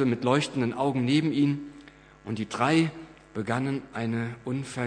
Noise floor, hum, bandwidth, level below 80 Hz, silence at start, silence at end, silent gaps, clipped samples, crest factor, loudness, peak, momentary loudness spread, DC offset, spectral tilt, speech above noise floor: -50 dBFS; none; 10 kHz; -62 dBFS; 0 s; 0 s; none; under 0.1%; 20 dB; -27 LUFS; -8 dBFS; 13 LU; under 0.1%; -6 dB/octave; 24 dB